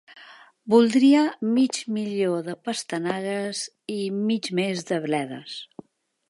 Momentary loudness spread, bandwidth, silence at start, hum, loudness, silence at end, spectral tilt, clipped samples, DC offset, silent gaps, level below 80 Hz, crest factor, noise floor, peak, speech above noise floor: 15 LU; 11.5 kHz; 0.1 s; none; -24 LUFS; 0.65 s; -5 dB/octave; under 0.1%; under 0.1%; none; -76 dBFS; 18 dB; -49 dBFS; -6 dBFS; 26 dB